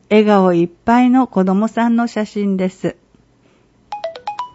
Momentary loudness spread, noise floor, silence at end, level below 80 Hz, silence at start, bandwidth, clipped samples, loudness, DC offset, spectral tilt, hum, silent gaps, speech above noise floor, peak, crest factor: 15 LU; -53 dBFS; 0.05 s; -54 dBFS; 0.1 s; 8 kHz; under 0.1%; -15 LUFS; under 0.1%; -7.5 dB/octave; none; none; 39 dB; 0 dBFS; 16 dB